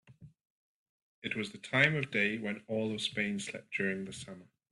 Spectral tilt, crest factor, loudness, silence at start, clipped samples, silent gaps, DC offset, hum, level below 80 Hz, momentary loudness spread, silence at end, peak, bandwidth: -4.5 dB/octave; 24 dB; -33 LUFS; 0.1 s; under 0.1%; 0.50-1.22 s; under 0.1%; none; -74 dBFS; 16 LU; 0.25 s; -12 dBFS; 11.5 kHz